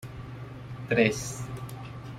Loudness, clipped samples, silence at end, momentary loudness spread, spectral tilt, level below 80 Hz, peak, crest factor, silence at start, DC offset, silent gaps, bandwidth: -29 LUFS; under 0.1%; 0 s; 17 LU; -5 dB/octave; -54 dBFS; -8 dBFS; 24 dB; 0 s; under 0.1%; none; 16 kHz